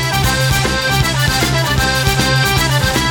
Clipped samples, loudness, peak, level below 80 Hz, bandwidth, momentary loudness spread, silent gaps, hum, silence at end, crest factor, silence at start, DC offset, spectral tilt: under 0.1%; -13 LUFS; -2 dBFS; -26 dBFS; 19 kHz; 1 LU; none; none; 0 s; 14 dB; 0 s; under 0.1%; -3.5 dB/octave